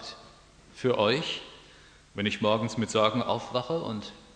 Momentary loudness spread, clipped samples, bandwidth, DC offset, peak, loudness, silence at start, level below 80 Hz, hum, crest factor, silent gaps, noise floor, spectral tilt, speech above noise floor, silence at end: 16 LU; under 0.1%; 10 kHz; under 0.1%; -8 dBFS; -28 LUFS; 0 s; -62 dBFS; none; 22 dB; none; -54 dBFS; -5 dB/octave; 27 dB; 0.1 s